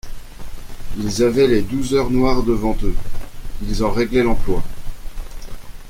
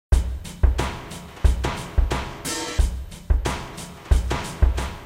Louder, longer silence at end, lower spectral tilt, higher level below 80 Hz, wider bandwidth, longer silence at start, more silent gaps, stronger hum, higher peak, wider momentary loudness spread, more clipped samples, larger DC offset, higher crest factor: first, -19 LUFS vs -25 LUFS; about the same, 0 s vs 0 s; about the same, -6 dB/octave vs -5 dB/octave; about the same, -26 dBFS vs -24 dBFS; about the same, 15.5 kHz vs 15.5 kHz; about the same, 0.05 s vs 0.1 s; neither; neither; about the same, -2 dBFS vs -4 dBFS; first, 22 LU vs 10 LU; neither; neither; about the same, 14 dB vs 18 dB